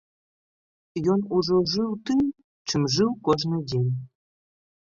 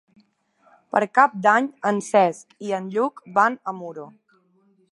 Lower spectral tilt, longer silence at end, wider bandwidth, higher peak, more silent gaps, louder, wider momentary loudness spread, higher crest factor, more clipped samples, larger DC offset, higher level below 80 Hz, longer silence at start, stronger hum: about the same, -6 dB/octave vs -5 dB/octave; about the same, 0.8 s vs 0.85 s; second, 7.4 kHz vs 11.5 kHz; second, -6 dBFS vs -2 dBFS; first, 2.44-2.65 s vs none; second, -25 LUFS vs -21 LUFS; second, 7 LU vs 16 LU; about the same, 20 dB vs 22 dB; neither; neither; first, -58 dBFS vs -78 dBFS; about the same, 0.95 s vs 0.95 s; neither